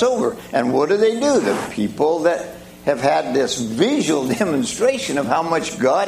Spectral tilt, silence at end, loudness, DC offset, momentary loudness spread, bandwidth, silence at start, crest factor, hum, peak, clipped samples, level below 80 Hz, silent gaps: -4.5 dB/octave; 0 s; -19 LUFS; under 0.1%; 5 LU; 15.5 kHz; 0 s; 16 dB; none; -2 dBFS; under 0.1%; -54 dBFS; none